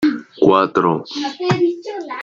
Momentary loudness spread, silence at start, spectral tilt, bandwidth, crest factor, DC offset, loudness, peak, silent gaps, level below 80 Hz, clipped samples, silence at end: 12 LU; 0 s; -6.5 dB/octave; 7.6 kHz; 16 dB; under 0.1%; -17 LUFS; -2 dBFS; none; -56 dBFS; under 0.1%; 0 s